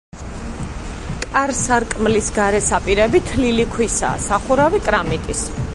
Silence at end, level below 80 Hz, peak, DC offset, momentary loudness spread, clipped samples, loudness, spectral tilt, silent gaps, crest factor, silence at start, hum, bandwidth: 0 s; -30 dBFS; -2 dBFS; under 0.1%; 14 LU; under 0.1%; -17 LUFS; -4 dB/octave; none; 16 dB; 0.15 s; none; 11.5 kHz